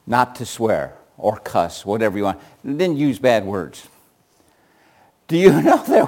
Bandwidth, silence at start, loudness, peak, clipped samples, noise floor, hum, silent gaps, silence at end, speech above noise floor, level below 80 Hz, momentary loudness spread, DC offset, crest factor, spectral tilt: 17 kHz; 0.05 s; -19 LUFS; 0 dBFS; under 0.1%; -58 dBFS; none; none; 0 s; 40 dB; -56 dBFS; 14 LU; under 0.1%; 18 dB; -6 dB/octave